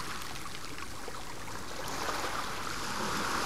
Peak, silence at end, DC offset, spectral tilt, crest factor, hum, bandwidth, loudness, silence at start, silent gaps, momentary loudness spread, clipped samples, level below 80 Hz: -20 dBFS; 0 s; 1%; -2.5 dB/octave; 18 dB; none; 16 kHz; -37 LUFS; 0 s; none; 8 LU; under 0.1%; -54 dBFS